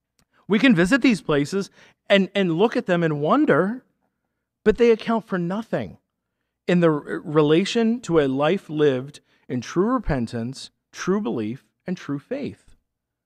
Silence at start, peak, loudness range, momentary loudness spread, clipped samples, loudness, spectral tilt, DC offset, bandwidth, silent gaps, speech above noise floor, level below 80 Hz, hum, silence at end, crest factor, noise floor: 0.5 s; -4 dBFS; 6 LU; 14 LU; under 0.1%; -21 LUFS; -6.5 dB/octave; under 0.1%; 12 kHz; none; 58 dB; -46 dBFS; none; 0.7 s; 18 dB; -79 dBFS